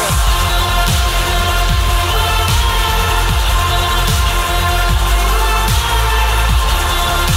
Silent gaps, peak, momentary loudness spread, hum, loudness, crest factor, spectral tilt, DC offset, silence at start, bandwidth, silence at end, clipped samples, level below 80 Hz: none; -2 dBFS; 1 LU; none; -14 LUFS; 12 dB; -3.5 dB/octave; under 0.1%; 0 s; 16.5 kHz; 0 s; under 0.1%; -16 dBFS